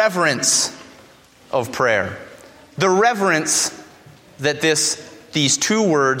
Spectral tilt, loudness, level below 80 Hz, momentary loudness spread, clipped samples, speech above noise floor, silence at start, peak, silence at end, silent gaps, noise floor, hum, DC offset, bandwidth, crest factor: -2.5 dB/octave; -18 LUFS; -62 dBFS; 10 LU; under 0.1%; 30 dB; 0 s; -2 dBFS; 0 s; none; -48 dBFS; none; under 0.1%; 16.5 kHz; 16 dB